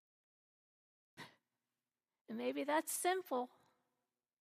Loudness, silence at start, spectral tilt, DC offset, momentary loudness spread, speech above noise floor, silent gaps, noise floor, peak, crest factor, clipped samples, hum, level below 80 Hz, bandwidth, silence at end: -40 LUFS; 1.2 s; -2 dB/octave; under 0.1%; 20 LU; over 51 dB; 2.21-2.25 s; under -90 dBFS; -24 dBFS; 20 dB; under 0.1%; none; under -90 dBFS; 15 kHz; 0.95 s